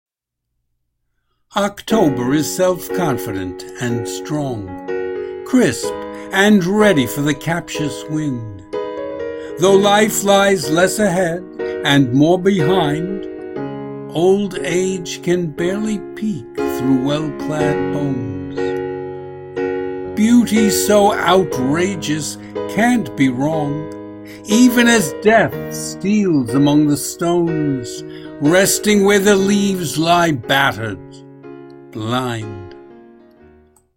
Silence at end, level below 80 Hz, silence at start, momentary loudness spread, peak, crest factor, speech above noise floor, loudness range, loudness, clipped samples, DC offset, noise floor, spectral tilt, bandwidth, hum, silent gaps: 0.95 s; -48 dBFS; 1.55 s; 14 LU; 0 dBFS; 16 dB; 62 dB; 6 LU; -16 LUFS; under 0.1%; under 0.1%; -78 dBFS; -5 dB/octave; 16.5 kHz; none; none